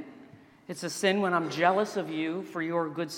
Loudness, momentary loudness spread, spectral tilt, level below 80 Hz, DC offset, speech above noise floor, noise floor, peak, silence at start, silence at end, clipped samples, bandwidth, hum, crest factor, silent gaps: -29 LUFS; 12 LU; -4.5 dB/octave; -80 dBFS; under 0.1%; 25 dB; -53 dBFS; -10 dBFS; 0 s; 0 s; under 0.1%; 17 kHz; none; 20 dB; none